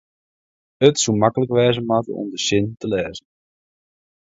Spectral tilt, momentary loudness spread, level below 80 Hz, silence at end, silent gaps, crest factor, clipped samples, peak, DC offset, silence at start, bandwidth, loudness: -4.5 dB/octave; 9 LU; -52 dBFS; 1.15 s; none; 20 dB; under 0.1%; 0 dBFS; under 0.1%; 0.8 s; 8 kHz; -19 LUFS